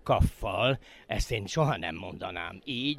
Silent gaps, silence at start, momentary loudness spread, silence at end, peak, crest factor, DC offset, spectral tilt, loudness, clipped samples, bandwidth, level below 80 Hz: none; 0.05 s; 10 LU; 0 s; -12 dBFS; 18 dB; under 0.1%; -5.5 dB/octave; -31 LUFS; under 0.1%; 16 kHz; -40 dBFS